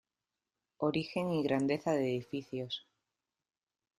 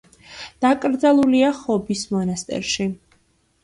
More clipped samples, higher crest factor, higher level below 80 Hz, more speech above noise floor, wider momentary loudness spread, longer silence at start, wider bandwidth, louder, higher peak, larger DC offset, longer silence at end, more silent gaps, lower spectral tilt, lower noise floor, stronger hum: neither; about the same, 18 dB vs 16 dB; second, -72 dBFS vs -54 dBFS; first, over 56 dB vs 43 dB; second, 9 LU vs 14 LU; first, 0.8 s vs 0.3 s; first, 14 kHz vs 11.5 kHz; second, -35 LUFS vs -20 LUFS; second, -18 dBFS vs -4 dBFS; neither; first, 1.2 s vs 0.65 s; neither; first, -6.5 dB/octave vs -5 dB/octave; first, under -90 dBFS vs -62 dBFS; neither